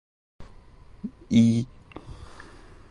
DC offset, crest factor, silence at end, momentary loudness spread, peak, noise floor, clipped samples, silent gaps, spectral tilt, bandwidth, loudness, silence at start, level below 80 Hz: under 0.1%; 20 dB; 0.5 s; 26 LU; -8 dBFS; -49 dBFS; under 0.1%; none; -7 dB/octave; 9.8 kHz; -22 LUFS; 0.4 s; -50 dBFS